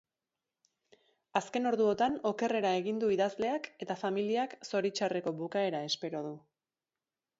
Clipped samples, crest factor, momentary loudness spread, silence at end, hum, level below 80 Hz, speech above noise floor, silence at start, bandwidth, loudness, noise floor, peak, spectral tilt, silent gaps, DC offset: under 0.1%; 20 dB; 8 LU; 1 s; none; -78 dBFS; over 58 dB; 1.35 s; 8 kHz; -33 LUFS; under -90 dBFS; -14 dBFS; -5 dB/octave; none; under 0.1%